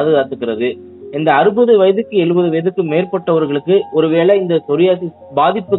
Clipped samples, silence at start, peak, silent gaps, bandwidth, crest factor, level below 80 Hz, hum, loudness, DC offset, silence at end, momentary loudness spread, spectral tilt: under 0.1%; 0 s; 0 dBFS; none; 4.1 kHz; 14 dB; -64 dBFS; none; -14 LUFS; under 0.1%; 0 s; 9 LU; -10 dB/octave